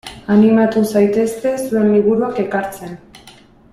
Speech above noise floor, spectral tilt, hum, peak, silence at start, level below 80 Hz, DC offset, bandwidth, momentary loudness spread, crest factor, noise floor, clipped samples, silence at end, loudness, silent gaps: 30 dB; -7 dB/octave; none; -2 dBFS; 0.05 s; -50 dBFS; under 0.1%; 13.5 kHz; 15 LU; 14 dB; -44 dBFS; under 0.1%; 0.4 s; -15 LUFS; none